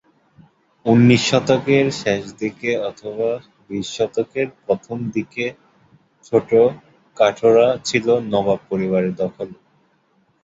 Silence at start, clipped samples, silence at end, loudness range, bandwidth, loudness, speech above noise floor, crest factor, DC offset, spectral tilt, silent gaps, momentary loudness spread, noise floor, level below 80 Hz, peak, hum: 0.85 s; under 0.1%; 0.9 s; 6 LU; 8 kHz; -19 LUFS; 43 dB; 18 dB; under 0.1%; -5.5 dB/octave; none; 13 LU; -61 dBFS; -56 dBFS; -2 dBFS; none